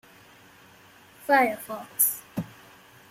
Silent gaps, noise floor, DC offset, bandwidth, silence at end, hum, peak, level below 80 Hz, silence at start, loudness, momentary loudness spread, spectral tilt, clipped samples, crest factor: none; -53 dBFS; under 0.1%; 16.5 kHz; 0.65 s; none; -8 dBFS; -70 dBFS; 1.25 s; -25 LUFS; 16 LU; -3 dB/octave; under 0.1%; 22 dB